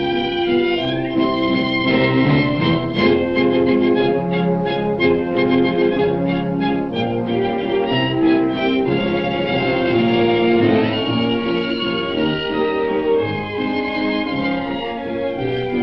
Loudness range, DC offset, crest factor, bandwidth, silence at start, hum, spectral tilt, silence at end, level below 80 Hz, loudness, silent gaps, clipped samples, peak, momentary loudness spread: 3 LU; under 0.1%; 14 dB; 5.8 kHz; 0 s; none; -8.5 dB/octave; 0 s; -44 dBFS; -18 LUFS; none; under 0.1%; -4 dBFS; 5 LU